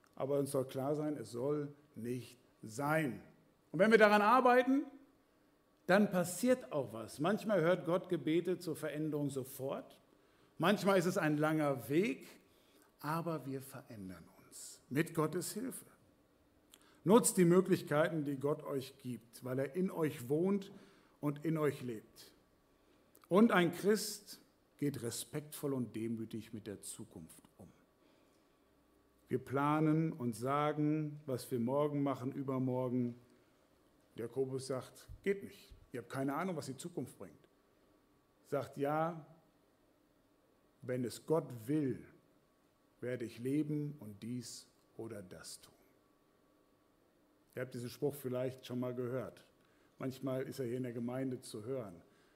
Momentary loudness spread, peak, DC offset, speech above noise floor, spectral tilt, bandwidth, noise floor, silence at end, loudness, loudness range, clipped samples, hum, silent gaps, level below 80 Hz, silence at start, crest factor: 19 LU; -14 dBFS; under 0.1%; 37 dB; -5.5 dB/octave; 16 kHz; -73 dBFS; 0.35 s; -36 LUFS; 11 LU; under 0.1%; none; none; -76 dBFS; 0.2 s; 24 dB